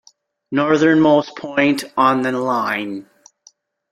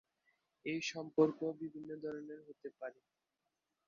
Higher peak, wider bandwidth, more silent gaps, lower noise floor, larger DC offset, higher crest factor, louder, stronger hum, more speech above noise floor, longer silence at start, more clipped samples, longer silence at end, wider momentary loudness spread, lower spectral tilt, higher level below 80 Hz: first, -2 dBFS vs -18 dBFS; first, 14 kHz vs 7.2 kHz; neither; second, -53 dBFS vs -88 dBFS; neither; second, 16 dB vs 24 dB; first, -17 LUFS vs -40 LUFS; neither; second, 37 dB vs 48 dB; second, 0.5 s vs 0.65 s; neither; about the same, 0.9 s vs 0.95 s; second, 11 LU vs 17 LU; about the same, -5.5 dB/octave vs -4.5 dB/octave; first, -62 dBFS vs -86 dBFS